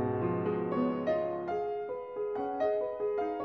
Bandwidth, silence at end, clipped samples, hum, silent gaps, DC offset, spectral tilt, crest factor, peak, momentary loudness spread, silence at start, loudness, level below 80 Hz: 6.2 kHz; 0 s; under 0.1%; none; none; under 0.1%; -9.5 dB/octave; 14 dB; -20 dBFS; 5 LU; 0 s; -33 LUFS; -66 dBFS